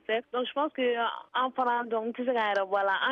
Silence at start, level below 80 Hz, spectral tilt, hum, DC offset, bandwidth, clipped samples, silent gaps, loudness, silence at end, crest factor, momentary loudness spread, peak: 0.1 s; -80 dBFS; -4.5 dB/octave; none; under 0.1%; 6.8 kHz; under 0.1%; none; -29 LUFS; 0 s; 14 dB; 4 LU; -16 dBFS